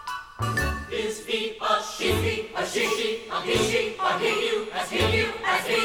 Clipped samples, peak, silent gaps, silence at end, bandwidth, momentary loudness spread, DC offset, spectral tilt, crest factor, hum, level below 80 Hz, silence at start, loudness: under 0.1%; -10 dBFS; none; 0 s; 17.5 kHz; 6 LU; under 0.1%; -3.5 dB/octave; 16 dB; none; -44 dBFS; 0 s; -25 LUFS